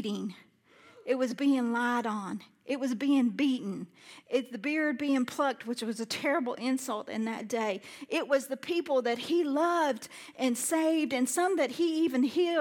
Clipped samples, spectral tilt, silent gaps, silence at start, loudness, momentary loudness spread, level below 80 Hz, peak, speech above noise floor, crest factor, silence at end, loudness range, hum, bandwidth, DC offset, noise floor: under 0.1%; -3.5 dB/octave; none; 0 s; -30 LUFS; 9 LU; -84 dBFS; -16 dBFS; 29 dB; 14 dB; 0 s; 3 LU; none; 17.5 kHz; under 0.1%; -59 dBFS